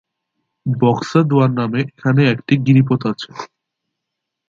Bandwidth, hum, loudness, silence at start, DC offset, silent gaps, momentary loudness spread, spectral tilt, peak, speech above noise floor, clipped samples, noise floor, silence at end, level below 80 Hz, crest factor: 7.6 kHz; none; -16 LUFS; 0.65 s; under 0.1%; none; 14 LU; -8 dB/octave; 0 dBFS; 64 dB; under 0.1%; -79 dBFS; 1.05 s; -58 dBFS; 16 dB